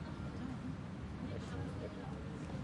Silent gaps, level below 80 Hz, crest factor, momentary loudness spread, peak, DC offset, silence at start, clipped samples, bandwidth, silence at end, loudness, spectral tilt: none; -56 dBFS; 12 dB; 2 LU; -32 dBFS; under 0.1%; 0 s; under 0.1%; 11 kHz; 0 s; -45 LUFS; -7.5 dB/octave